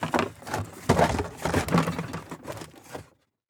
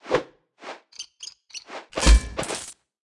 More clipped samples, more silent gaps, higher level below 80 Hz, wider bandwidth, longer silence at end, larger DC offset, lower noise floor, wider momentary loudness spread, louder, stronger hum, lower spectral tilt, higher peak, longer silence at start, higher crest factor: neither; neither; second, -46 dBFS vs -26 dBFS; first, over 20 kHz vs 12 kHz; first, 0.5 s vs 0.35 s; neither; first, -53 dBFS vs -44 dBFS; second, 18 LU vs 22 LU; second, -27 LUFS vs -23 LUFS; neither; first, -5.5 dB/octave vs -4 dB/octave; about the same, -6 dBFS vs -4 dBFS; about the same, 0 s vs 0.05 s; about the same, 22 dB vs 22 dB